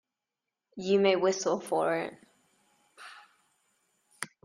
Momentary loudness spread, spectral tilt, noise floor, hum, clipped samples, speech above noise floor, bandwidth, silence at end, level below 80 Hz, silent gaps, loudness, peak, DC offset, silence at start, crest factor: 24 LU; -4 dB/octave; -89 dBFS; none; under 0.1%; 61 dB; 14 kHz; 0.2 s; -78 dBFS; none; -28 LUFS; -12 dBFS; under 0.1%; 0.75 s; 22 dB